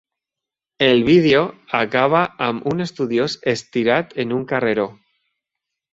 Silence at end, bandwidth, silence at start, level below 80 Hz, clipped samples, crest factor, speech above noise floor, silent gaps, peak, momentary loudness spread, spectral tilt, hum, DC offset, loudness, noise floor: 1 s; 8 kHz; 0.8 s; -56 dBFS; under 0.1%; 18 dB; 69 dB; none; -2 dBFS; 10 LU; -6 dB/octave; none; under 0.1%; -18 LUFS; -87 dBFS